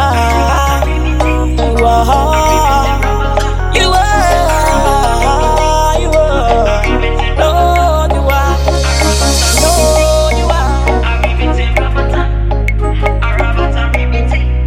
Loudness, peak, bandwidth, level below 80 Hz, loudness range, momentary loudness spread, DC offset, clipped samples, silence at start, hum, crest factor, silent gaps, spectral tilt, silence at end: -11 LUFS; 0 dBFS; 16.5 kHz; -14 dBFS; 3 LU; 4 LU; under 0.1%; under 0.1%; 0 s; none; 10 dB; none; -4.5 dB/octave; 0 s